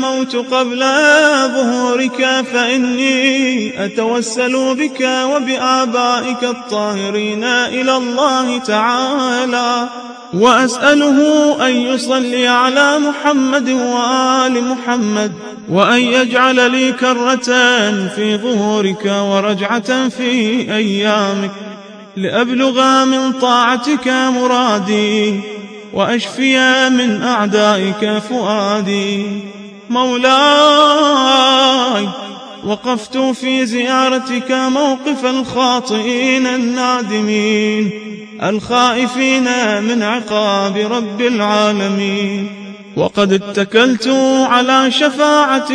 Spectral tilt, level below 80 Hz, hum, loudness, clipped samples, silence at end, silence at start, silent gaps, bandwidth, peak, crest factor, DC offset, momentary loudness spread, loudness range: -3.5 dB/octave; -60 dBFS; none; -13 LUFS; under 0.1%; 0 s; 0 s; none; 10.5 kHz; 0 dBFS; 14 dB; under 0.1%; 8 LU; 4 LU